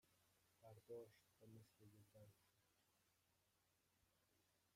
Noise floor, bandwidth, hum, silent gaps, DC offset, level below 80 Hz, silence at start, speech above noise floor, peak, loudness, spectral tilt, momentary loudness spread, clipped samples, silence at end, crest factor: -85 dBFS; 15.5 kHz; none; none; under 0.1%; under -90 dBFS; 0.05 s; 21 dB; -48 dBFS; -64 LUFS; -6 dB/octave; 8 LU; under 0.1%; 0 s; 20 dB